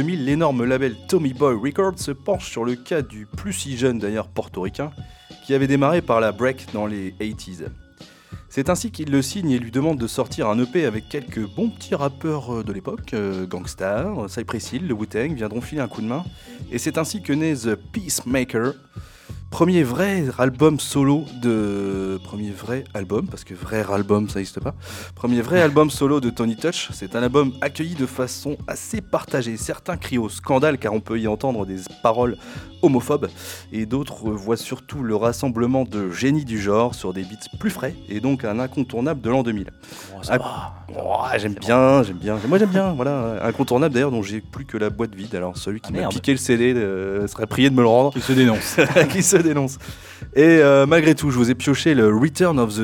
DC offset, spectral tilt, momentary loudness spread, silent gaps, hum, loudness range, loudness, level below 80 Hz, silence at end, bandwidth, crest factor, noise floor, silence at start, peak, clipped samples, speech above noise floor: under 0.1%; -5.5 dB/octave; 14 LU; none; none; 8 LU; -21 LUFS; -46 dBFS; 0 s; 18.5 kHz; 20 dB; -46 dBFS; 0 s; -2 dBFS; under 0.1%; 26 dB